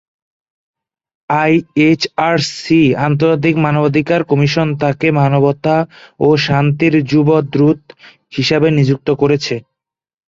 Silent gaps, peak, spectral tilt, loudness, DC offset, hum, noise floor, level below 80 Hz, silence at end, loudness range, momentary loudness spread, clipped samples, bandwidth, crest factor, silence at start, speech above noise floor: none; -2 dBFS; -7 dB/octave; -13 LUFS; under 0.1%; none; -80 dBFS; -50 dBFS; 0.7 s; 1 LU; 5 LU; under 0.1%; 7.8 kHz; 12 dB; 1.3 s; 67 dB